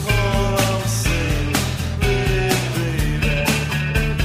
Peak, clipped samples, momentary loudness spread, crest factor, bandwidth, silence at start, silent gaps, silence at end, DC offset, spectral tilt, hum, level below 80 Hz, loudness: -4 dBFS; under 0.1%; 3 LU; 16 dB; 15.5 kHz; 0 s; none; 0 s; under 0.1%; -4.5 dB/octave; none; -26 dBFS; -20 LUFS